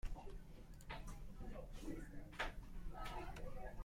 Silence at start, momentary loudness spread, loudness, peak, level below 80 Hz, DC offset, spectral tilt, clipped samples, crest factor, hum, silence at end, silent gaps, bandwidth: 0.05 s; 10 LU; -53 LUFS; -30 dBFS; -52 dBFS; under 0.1%; -5 dB/octave; under 0.1%; 18 dB; none; 0 s; none; 16 kHz